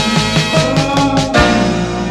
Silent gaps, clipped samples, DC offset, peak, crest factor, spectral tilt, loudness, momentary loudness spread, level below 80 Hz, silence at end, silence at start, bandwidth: none; under 0.1%; under 0.1%; 0 dBFS; 12 dB; -5 dB/octave; -13 LUFS; 3 LU; -28 dBFS; 0 s; 0 s; 13.5 kHz